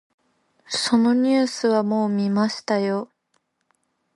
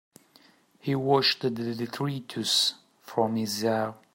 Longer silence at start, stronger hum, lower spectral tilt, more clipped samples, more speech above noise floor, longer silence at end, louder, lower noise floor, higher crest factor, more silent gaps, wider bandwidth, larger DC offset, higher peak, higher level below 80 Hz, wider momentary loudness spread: second, 0.7 s vs 0.85 s; neither; about the same, -5 dB/octave vs -4 dB/octave; neither; first, 50 dB vs 32 dB; first, 1.1 s vs 0.2 s; first, -21 LUFS vs -27 LUFS; first, -71 dBFS vs -60 dBFS; about the same, 14 dB vs 18 dB; neither; second, 11.5 kHz vs 16.5 kHz; neither; about the same, -8 dBFS vs -10 dBFS; first, -68 dBFS vs -74 dBFS; about the same, 8 LU vs 9 LU